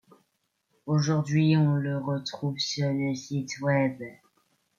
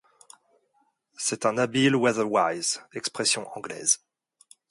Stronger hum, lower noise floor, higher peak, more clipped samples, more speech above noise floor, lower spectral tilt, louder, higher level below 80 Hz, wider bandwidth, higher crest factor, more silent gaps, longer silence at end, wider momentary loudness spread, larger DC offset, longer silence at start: neither; first, -76 dBFS vs -70 dBFS; second, -12 dBFS vs -8 dBFS; neither; first, 50 dB vs 44 dB; first, -6 dB/octave vs -3 dB/octave; about the same, -27 LUFS vs -25 LUFS; about the same, -68 dBFS vs -72 dBFS; second, 7.4 kHz vs 11.5 kHz; about the same, 16 dB vs 20 dB; neither; about the same, 0.65 s vs 0.75 s; about the same, 10 LU vs 8 LU; neither; second, 0.85 s vs 1.2 s